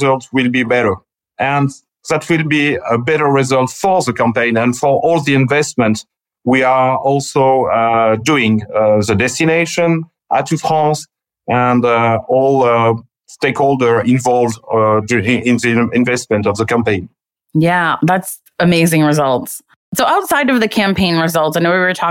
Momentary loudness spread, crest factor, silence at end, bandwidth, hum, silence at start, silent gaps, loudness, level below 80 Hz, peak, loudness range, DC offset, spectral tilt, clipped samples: 6 LU; 10 dB; 0 s; 17 kHz; none; 0 s; 19.76-19.92 s; -14 LUFS; -50 dBFS; -4 dBFS; 2 LU; under 0.1%; -5.5 dB/octave; under 0.1%